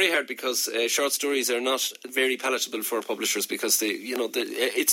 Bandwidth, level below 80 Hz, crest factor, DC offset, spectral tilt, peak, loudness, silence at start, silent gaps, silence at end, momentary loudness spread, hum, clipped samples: 17 kHz; under -90 dBFS; 20 dB; under 0.1%; 0 dB/octave; -6 dBFS; -25 LUFS; 0 s; none; 0 s; 5 LU; none; under 0.1%